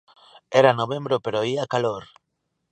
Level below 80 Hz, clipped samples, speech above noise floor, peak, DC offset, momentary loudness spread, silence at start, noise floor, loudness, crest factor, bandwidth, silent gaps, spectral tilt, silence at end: -66 dBFS; under 0.1%; 55 dB; -2 dBFS; under 0.1%; 8 LU; 0.5 s; -77 dBFS; -22 LUFS; 22 dB; 9.6 kHz; none; -5.5 dB/octave; 0.7 s